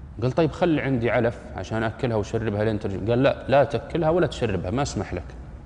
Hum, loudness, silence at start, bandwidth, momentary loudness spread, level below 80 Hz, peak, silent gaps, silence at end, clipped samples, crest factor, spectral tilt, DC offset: none; -24 LUFS; 0 s; 10 kHz; 9 LU; -42 dBFS; -8 dBFS; none; 0 s; under 0.1%; 14 dB; -7 dB/octave; under 0.1%